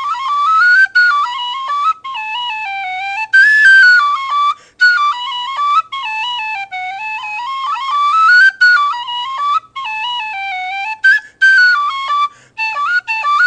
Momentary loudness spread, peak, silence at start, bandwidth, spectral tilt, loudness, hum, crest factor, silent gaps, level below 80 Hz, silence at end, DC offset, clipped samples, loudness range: 13 LU; 0 dBFS; 0 s; 9.8 kHz; 2 dB/octave; -12 LUFS; none; 12 dB; none; -66 dBFS; 0 s; under 0.1%; under 0.1%; 5 LU